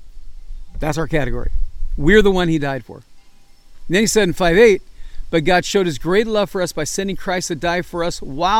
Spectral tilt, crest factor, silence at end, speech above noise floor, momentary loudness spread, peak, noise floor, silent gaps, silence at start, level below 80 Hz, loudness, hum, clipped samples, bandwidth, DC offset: -4.5 dB/octave; 18 dB; 0 s; 27 dB; 13 LU; 0 dBFS; -43 dBFS; none; 0 s; -28 dBFS; -17 LUFS; none; under 0.1%; 16 kHz; under 0.1%